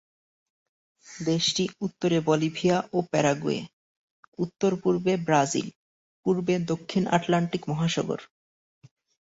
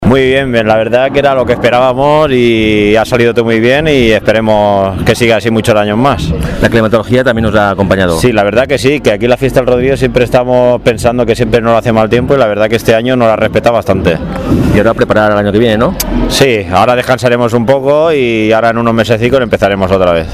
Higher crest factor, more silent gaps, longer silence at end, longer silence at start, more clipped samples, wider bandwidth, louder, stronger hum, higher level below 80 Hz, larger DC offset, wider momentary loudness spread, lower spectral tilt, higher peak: first, 20 dB vs 8 dB; first, 3.73-4.32 s, 5.76-6.23 s vs none; first, 0.95 s vs 0 s; first, 1.05 s vs 0 s; second, under 0.1% vs 0.6%; second, 8 kHz vs 15.5 kHz; second, -26 LUFS vs -9 LUFS; neither; second, -64 dBFS vs -26 dBFS; second, under 0.1% vs 0.2%; first, 10 LU vs 2 LU; about the same, -5 dB/octave vs -6 dB/octave; second, -6 dBFS vs 0 dBFS